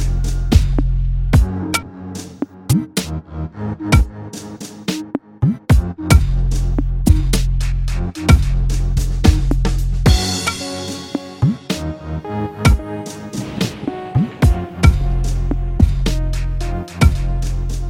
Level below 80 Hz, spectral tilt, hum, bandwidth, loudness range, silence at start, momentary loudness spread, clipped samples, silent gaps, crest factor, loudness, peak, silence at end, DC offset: -20 dBFS; -5.5 dB/octave; none; 16 kHz; 4 LU; 0 s; 12 LU; under 0.1%; none; 16 dB; -18 LUFS; 0 dBFS; 0 s; under 0.1%